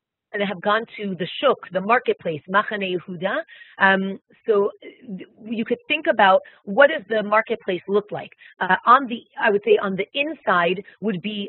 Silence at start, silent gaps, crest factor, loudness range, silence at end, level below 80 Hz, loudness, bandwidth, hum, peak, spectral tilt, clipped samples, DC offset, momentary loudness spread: 0.35 s; none; 20 dB; 3 LU; 0 s; -72 dBFS; -21 LUFS; 4.2 kHz; none; 0 dBFS; -2.5 dB/octave; under 0.1%; under 0.1%; 14 LU